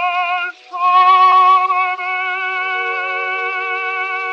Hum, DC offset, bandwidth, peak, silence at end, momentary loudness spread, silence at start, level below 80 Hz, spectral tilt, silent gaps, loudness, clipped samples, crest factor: none; under 0.1%; 6.8 kHz; -2 dBFS; 0 s; 10 LU; 0 s; -88 dBFS; 0 dB/octave; none; -15 LUFS; under 0.1%; 14 dB